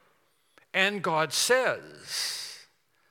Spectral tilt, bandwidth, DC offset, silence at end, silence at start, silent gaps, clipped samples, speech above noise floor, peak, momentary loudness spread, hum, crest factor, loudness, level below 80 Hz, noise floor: -1.5 dB/octave; 18 kHz; under 0.1%; 0.5 s; 0.75 s; none; under 0.1%; 41 dB; -8 dBFS; 14 LU; none; 22 dB; -27 LUFS; -84 dBFS; -69 dBFS